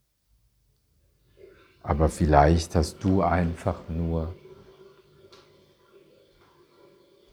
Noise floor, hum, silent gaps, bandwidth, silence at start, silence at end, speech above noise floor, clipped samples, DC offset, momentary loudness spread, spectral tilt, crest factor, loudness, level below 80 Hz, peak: -67 dBFS; none; none; 13 kHz; 1.85 s; 2.8 s; 44 dB; under 0.1%; under 0.1%; 13 LU; -7 dB/octave; 26 dB; -24 LUFS; -36 dBFS; -2 dBFS